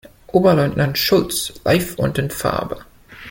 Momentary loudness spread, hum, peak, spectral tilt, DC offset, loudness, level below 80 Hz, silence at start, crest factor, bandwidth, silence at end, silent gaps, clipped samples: 11 LU; none; -2 dBFS; -5 dB/octave; under 0.1%; -18 LUFS; -44 dBFS; 0.35 s; 16 dB; 17 kHz; 0 s; none; under 0.1%